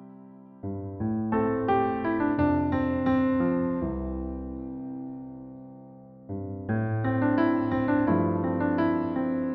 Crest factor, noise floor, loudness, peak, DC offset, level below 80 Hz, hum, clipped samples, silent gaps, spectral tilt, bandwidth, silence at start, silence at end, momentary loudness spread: 16 dB; -48 dBFS; -27 LUFS; -12 dBFS; under 0.1%; -48 dBFS; none; under 0.1%; none; -8 dB/octave; 5 kHz; 0 s; 0 s; 15 LU